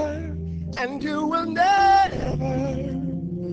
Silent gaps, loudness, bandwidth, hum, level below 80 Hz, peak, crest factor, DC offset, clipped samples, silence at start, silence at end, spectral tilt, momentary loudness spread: none; -23 LUFS; 8 kHz; none; -38 dBFS; -8 dBFS; 14 dB; under 0.1%; under 0.1%; 0 s; 0 s; -6.5 dB/octave; 14 LU